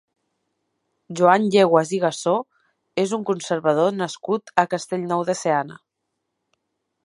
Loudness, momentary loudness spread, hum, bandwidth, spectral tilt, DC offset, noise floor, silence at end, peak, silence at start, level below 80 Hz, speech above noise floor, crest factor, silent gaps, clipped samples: -21 LUFS; 10 LU; none; 11.5 kHz; -5 dB/octave; under 0.1%; -78 dBFS; 1.3 s; 0 dBFS; 1.1 s; -72 dBFS; 58 dB; 22 dB; none; under 0.1%